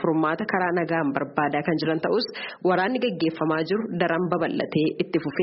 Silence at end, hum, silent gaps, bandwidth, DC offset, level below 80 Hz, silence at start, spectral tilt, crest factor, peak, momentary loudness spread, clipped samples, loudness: 0 s; none; none; 5.8 kHz; under 0.1%; -64 dBFS; 0 s; -4.5 dB/octave; 18 dB; -6 dBFS; 3 LU; under 0.1%; -24 LUFS